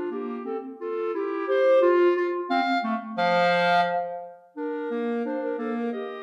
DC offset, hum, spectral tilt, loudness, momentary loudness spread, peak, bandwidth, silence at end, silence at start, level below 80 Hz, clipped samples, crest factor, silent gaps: under 0.1%; none; -6.5 dB/octave; -25 LUFS; 13 LU; -10 dBFS; 8.2 kHz; 0 s; 0 s; -84 dBFS; under 0.1%; 14 dB; none